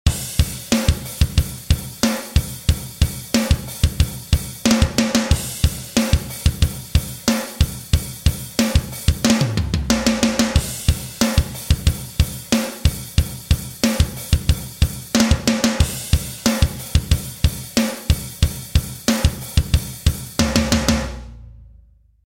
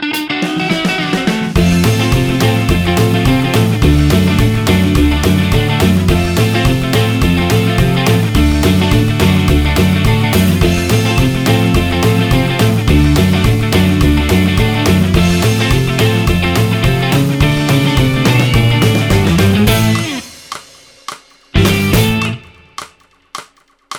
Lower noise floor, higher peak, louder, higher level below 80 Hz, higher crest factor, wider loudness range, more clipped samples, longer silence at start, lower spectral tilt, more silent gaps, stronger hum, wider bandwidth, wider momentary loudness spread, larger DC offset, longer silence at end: first, -50 dBFS vs -45 dBFS; about the same, 0 dBFS vs 0 dBFS; second, -20 LUFS vs -12 LUFS; about the same, -24 dBFS vs -22 dBFS; first, 18 dB vs 12 dB; about the same, 2 LU vs 2 LU; neither; about the same, 0.05 s vs 0 s; about the same, -4.5 dB/octave vs -5.5 dB/octave; neither; neither; second, 16.5 kHz vs 19.5 kHz; about the same, 5 LU vs 6 LU; neither; first, 0.6 s vs 0 s